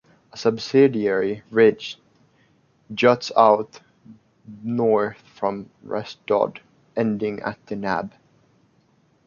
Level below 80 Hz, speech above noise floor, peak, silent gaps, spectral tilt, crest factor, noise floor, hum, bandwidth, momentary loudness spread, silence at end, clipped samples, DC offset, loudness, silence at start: -64 dBFS; 40 dB; -2 dBFS; none; -6 dB/octave; 22 dB; -61 dBFS; none; 7.2 kHz; 17 LU; 1.2 s; under 0.1%; under 0.1%; -21 LUFS; 0.35 s